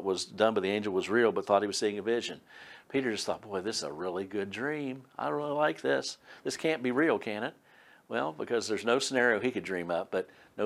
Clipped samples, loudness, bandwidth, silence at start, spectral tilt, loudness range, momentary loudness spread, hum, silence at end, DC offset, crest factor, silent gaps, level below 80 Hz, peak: under 0.1%; -31 LUFS; 13.5 kHz; 0 s; -4 dB/octave; 4 LU; 10 LU; none; 0 s; under 0.1%; 20 dB; none; -76 dBFS; -10 dBFS